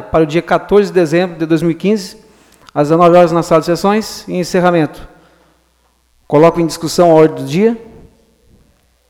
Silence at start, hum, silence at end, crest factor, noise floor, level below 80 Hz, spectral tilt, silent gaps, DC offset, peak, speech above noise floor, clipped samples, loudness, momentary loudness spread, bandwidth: 0 s; none; 1.25 s; 12 dB; -56 dBFS; -42 dBFS; -6.5 dB/octave; none; under 0.1%; 0 dBFS; 45 dB; under 0.1%; -12 LUFS; 10 LU; 16.5 kHz